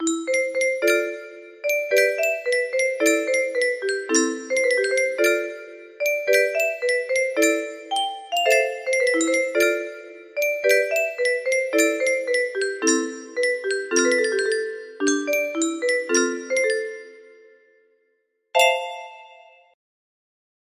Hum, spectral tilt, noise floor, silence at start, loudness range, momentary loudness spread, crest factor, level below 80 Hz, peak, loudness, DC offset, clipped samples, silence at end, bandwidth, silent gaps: none; 0 dB/octave; -70 dBFS; 0 s; 4 LU; 8 LU; 18 dB; -72 dBFS; -4 dBFS; -21 LUFS; under 0.1%; under 0.1%; 1.4 s; 15.5 kHz; none